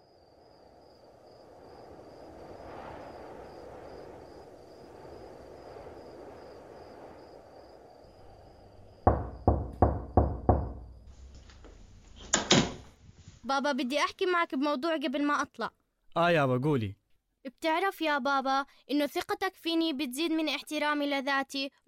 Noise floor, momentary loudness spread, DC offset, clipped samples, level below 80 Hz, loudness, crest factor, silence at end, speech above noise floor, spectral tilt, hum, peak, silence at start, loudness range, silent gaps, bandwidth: -59 dBFS; 22 LU; under 0.1%; under 0.1%; -46 dBFS; -30 LUFS; 26 dB; 0.2 s; 29 dB; -4.5 dB/octave; none; -8 dBFS; 1.4 s; 19 LU; none; 16 kHz